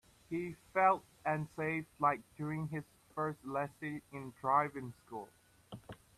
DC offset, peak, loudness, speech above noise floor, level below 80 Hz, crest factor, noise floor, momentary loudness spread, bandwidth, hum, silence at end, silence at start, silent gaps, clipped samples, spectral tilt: under 0.1%; -16 dBFS; -37 LUFS; 18 dB; -72 dBFS; 22 dB; -55 dBFS; 17 LU; 14 kHz; none; 0.25 s; 0.3 s; none; under 0.1%; -7.5 dB/octave